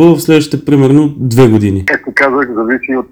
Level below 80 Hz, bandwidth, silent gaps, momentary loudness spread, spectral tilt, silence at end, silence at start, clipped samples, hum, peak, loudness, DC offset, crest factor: -42 dBFS; over 20 kHz; none; 6 LU; -7 dB/octave; 0.05 s; 0 s; 3%; none; 0 dBFS; -10 LUFS; under 0.1%; 10 dB